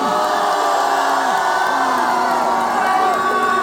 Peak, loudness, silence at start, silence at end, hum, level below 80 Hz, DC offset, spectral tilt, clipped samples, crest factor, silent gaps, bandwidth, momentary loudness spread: -4 dBFS; -16 LUFS; 0 s; 0 s; none; -58 dBFS; under 0.1%; -2.5 dB/octave; under 0.1%; 12 dB; none; 20 kHz; 1 LU